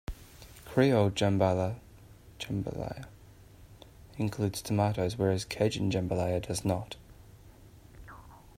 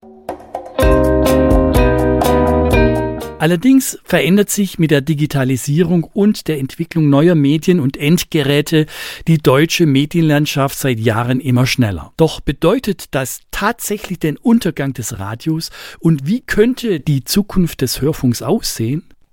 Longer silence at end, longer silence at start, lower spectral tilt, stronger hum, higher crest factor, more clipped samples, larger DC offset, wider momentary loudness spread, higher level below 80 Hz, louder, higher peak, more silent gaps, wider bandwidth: about the same, 0.2 s vs 0.3 s; about the same, 0.1 s vs 0.05 s; about the same, -6 dB/octave vs -6 dB/octave; neither; first, 20 dB vs 14 dB; neither; neither; first, 23 LU vs 9 LU; second, -54 dBFS vs -28 dBFS; second, -30 LUFS vs -15 LUFS; second, -10 dBFS vs 0 dBFS; neither; about the same, 16 kHz vs 17 kHz